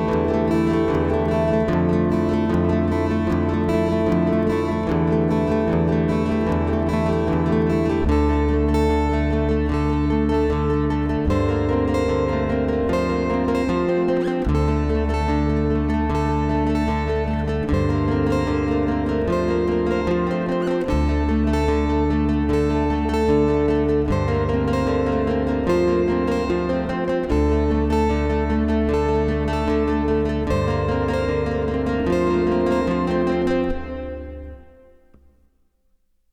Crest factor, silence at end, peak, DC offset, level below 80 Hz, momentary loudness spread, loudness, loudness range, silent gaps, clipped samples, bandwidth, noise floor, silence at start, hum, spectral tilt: 14 dB; 1.7 s; -6 dBFS; under 0.1%; -28 dBFS; 3 LU; -21 LUFS; 1 LU; none; under 0.1%; 9.6 kHz; -63 dBFS; 0 s; none; -8 dB/octave